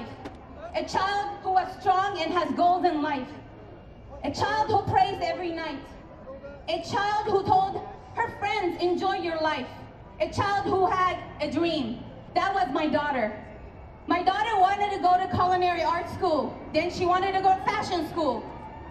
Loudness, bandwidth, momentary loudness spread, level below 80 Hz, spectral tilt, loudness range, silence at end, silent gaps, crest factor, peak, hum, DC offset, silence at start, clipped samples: -26 LUFS; 12 kHz; 19 LU; -50 dBFS; -5.5 dB/octave; 4 LU; 0 s; none; 18 dB; -8 dBFS; none; under 0.1%; 0 s; under 0.1%